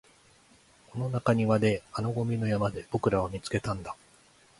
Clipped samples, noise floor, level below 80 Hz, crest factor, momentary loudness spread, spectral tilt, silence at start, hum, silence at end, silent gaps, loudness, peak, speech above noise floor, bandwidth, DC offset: under 0.1%; -60 dBFS; -54 dBFS; 20 dB; 11 LU; -7 dB/octave; 0.95 s; none; 0.65 s; none; -29 LUFS; -10 dBFS; 32 dB; 11.5 kHz; under 0.1%